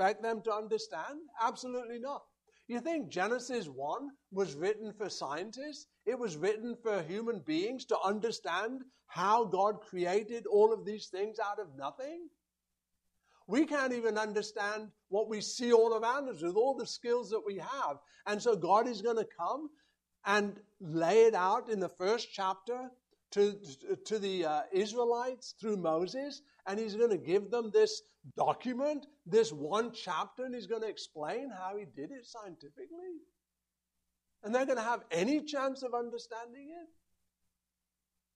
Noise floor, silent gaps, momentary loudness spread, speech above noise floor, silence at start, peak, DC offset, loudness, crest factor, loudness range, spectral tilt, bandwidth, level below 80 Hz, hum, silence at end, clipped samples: -89 dBFS; none; 15 LU; 55 dB; 0 s; -14 dBFS; under 0.1%; -34 LUFS; 22 dB; 6 LU; -4.5 dB/octave; 10.5 kHz; -82 dBFS; none; 1.5 s; under 0.1%